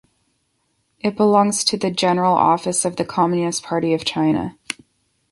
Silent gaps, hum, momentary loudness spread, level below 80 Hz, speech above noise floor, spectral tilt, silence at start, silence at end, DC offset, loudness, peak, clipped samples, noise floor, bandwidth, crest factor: none; none; 10 LU; -56 dBFS; 50 dB; -4 dB/octave; 1.05 s; 0.6 s; under 0.1%; -19 LUFS; -2 dBFS; under 0.1%; -68 dBFS; 11.5 kHz; 18 dB